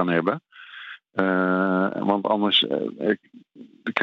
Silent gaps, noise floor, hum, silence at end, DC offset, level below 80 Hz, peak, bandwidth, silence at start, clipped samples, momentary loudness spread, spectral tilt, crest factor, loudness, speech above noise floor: none; -42 dBFS; none; 0 s; under 0.1%; -74 dBFS; -4 dBFS; 6.4 kHz; 0 s; under 0.1%; 18 LU; -7 dB/octave; 20 dB; -23 LUFS; 19 dB